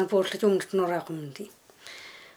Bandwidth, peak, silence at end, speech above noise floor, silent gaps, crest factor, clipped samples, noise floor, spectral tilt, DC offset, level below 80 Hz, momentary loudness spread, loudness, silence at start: 20 kHz; -12 dBFS; 0.1 s; 20 dB; none; 18 dB; under 0.1%; -47 dBFS; -5.5 dB/octave; under 0.1%; -80 dBFS; 20 LU; -27 LUFS; 0 s